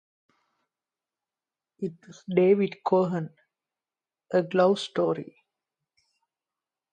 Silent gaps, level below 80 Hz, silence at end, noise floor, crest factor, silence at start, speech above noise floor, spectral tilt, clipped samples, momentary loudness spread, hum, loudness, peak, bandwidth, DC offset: none; -76 dBFS; 1.7 s; under -90 dBFS; 20 dB; 1.8 s; over 65 dB; -7 dB/octave; under 0.1%; 14 LU; none; -26 LUFS; -8 dBFS; 9.4 kHz; under 0.1%